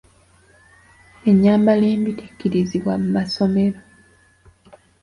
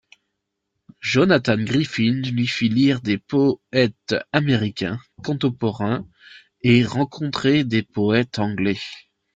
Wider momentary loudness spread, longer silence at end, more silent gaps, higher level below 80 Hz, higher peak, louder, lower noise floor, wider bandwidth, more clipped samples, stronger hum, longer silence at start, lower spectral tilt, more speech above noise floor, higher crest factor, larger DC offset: about the same, 10 LU vs 9 LU; first, 1.25 s vs 0.35 s; neither; about the same, -52 dBFS vs -56 dBFS; about the same, -4 dBFS vs -4 dBFS; first, -18 LUFS vs -21 LUFS; second, -54 dBFS vs -78 dBFS; first, 11 kHz vs 7.8 kHz; neither; neither; first, 1.25 s vs 1.05 s; first, -8 dB/octave vs -6.5 dB/octave; second, 36 dB vs 58 dB; about the same, 16 dB vs 18 dB; neither